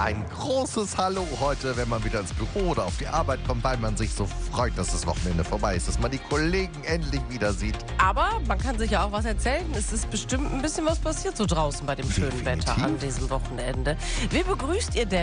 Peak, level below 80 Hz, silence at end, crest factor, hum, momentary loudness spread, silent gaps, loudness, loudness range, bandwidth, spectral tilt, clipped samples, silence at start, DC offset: -8 dBFS; -32 dBFS; 0 s; 18 dB; none; 4 LU; none; -27 LUFS; 1 LU; 10 kHz; -4.5 dB/octave; under 0.1%; 0 s; under 0.1%